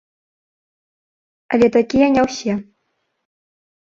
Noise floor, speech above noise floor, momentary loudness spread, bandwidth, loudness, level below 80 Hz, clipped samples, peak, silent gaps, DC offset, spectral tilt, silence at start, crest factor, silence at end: -71 dBFS; 55 dB; 9 LU; 7.8 kHz; -17 LUFS; -52 dBFS; under 0.1%; -2 dBFS; none; under 0.1%; -5.5 dB/octave; 1.5 s; 18 dB; 1.2 s